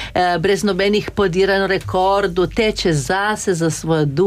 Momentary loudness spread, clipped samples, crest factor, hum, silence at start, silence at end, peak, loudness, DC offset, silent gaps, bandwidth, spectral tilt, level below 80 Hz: 3 LU; under 0.1%; 12 dB; none; 0 s; 0 s; -6 dBFS; -17 LUFS; under 0.1%; none; 15.5 kHz; -5 dB/octave; -38 dBFS